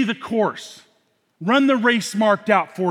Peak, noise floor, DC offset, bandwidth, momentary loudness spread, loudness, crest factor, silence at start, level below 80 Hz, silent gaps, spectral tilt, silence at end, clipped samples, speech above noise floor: -2 dBFS; -65 dBFS; under 0.1%; 15 kHz; 12 LU; -19 LUFS; 18 dB; 0 s; -72 dBFS; none; -5 dB/octave; 0 s; under 0.1%; 45 dB